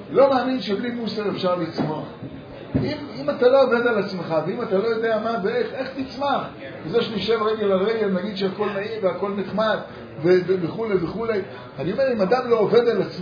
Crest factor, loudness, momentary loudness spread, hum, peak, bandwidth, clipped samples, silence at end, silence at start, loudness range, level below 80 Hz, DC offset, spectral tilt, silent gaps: 16 dB; -22 LUFS; 10 LU; none; -6 dBFS; 5.4 kHz; under 0.1%; 0 s; 0 s; 2 LU; -54 dBFS; under 0.1%; -7.5 dB/octave; none